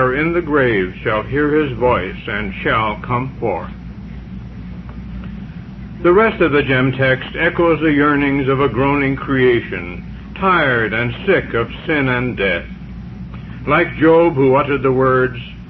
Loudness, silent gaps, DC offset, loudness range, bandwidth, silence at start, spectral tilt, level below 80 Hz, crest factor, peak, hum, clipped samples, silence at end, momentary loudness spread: -16 LUFS; none; under 0.1%; 7 LU; 5.8 kHz; 0 s; -9.5 dB/octave; -36 dBFS; 14 dB; -2 dBFS; none; under 0.1%; 0 s; 18 LU